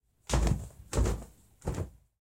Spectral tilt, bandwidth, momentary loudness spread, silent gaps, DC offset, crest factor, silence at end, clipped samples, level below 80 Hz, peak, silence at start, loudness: -5.5 dB/octave; 16 kHz; 12 LU; none; under 0.1%; 18 dB; 0.3 s; under 0.1%; -36 dBFS; -16 dBFS; 0.3 s; -34 LUFS